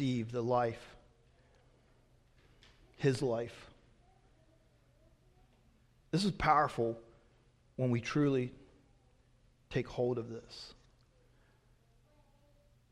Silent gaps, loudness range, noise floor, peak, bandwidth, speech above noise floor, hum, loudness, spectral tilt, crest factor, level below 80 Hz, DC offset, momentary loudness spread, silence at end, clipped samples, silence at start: none; 8 LU; -68 dBFS; -14 dBFS; 12 kHz; 34 dB; none; -35 LUFS; -6.5 dB/octave; 24 dB; -62 dBFS; under 0.1%; 20 LU; 2.2 s; under 0.1%; 0 s